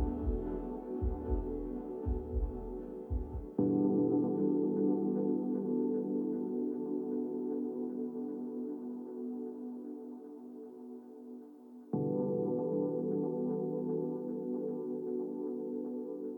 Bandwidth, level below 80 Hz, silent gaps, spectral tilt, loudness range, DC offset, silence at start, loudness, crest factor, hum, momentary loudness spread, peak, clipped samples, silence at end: 2.2 kHz; -46 dBFS; none; -12.5 dB/octave; 9 LU; under 0.1%; 0 s; -36 LUFS; 16 dB; none; 15 LU; -18 dBFS; under 0.1%; 0 s